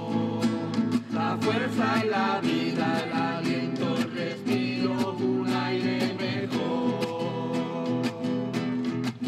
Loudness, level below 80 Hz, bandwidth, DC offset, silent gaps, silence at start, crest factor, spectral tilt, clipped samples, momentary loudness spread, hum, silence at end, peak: -27 LUFS; -70 dBFS; 14 kHz; under 0.1%; none; 0 s; 14 dB; -6 dB/octave; under 0.1%; 4 LU; none; 0 s; -12 dBFS